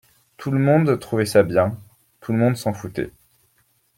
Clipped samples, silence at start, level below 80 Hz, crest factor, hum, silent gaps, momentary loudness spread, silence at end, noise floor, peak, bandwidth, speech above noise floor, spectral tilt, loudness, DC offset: under 0.1%; 0.4 s; -56 dBFS; 18 dB; none; none; 16 LU; 0.9 s; -64 dBFS; -2 dBFS; 16.5 kHz; 45 dB; -7 dB/octave; -20 LUFS; under 0.1%